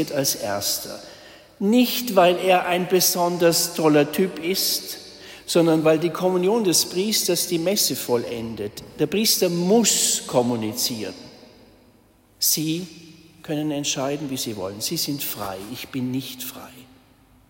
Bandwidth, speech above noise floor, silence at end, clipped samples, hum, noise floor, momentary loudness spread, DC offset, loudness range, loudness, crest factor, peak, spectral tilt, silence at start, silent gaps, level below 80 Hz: 16.5 kHz; 34 dB; 0.65 s; under 0.1%; none; -56 dBFS; 14 LU; under 0.1%; 7 LU; -21 LUFS; 18 dB; -4 dBFS; -3.5 dB/octave; 0 s; none; -60 dBFS